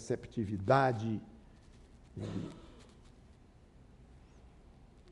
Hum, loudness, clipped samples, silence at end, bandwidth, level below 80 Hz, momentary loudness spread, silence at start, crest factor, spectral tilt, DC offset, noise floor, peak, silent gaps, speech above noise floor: none; -35 LUFS; under 0.1%; 0 s; 11 kHz; -60 dBFS; 27 LU; 0 s; 24 dB; -7 dB/octave; under 0.1%; -60 dBFS; -14 dBFS; none; 26 dB